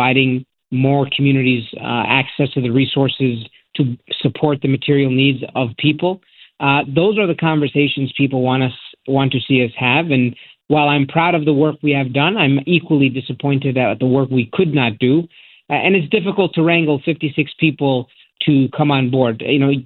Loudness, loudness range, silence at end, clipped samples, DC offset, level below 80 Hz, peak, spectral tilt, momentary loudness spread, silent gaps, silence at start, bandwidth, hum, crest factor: -16 LUFS; 2 LU; 0 s; under 0.1%; under 0.1%; -56 dBFS; 0 dBFS; -11 dB/octave; 6 LU; none; 0 s; 4.3 kHz; none; 16 dB